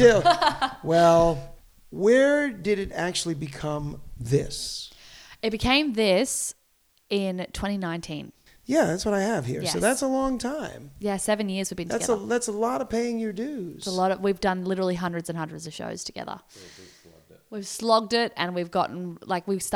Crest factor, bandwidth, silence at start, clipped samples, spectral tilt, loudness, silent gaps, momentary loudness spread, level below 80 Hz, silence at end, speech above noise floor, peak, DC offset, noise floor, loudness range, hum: 22 dB; 16.5 kHz; 0 s; under 0.1%; -4.5 dB/octave; -25 LUFS; none; 15 LU; -48 dBFS; 0 s; 41 dB; -4 dBFS; under 0.1%; -66 dBFS; 6 LU; none